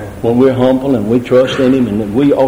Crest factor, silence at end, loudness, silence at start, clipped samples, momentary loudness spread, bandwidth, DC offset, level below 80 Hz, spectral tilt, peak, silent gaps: 10 dB; 0 s; -12 LUFS; 0 s; under 0.1%; 3 LU; 16.5 kHz; under 0.1%; -40 dBFS; -7.5 dB/octave; 0 dBFS; none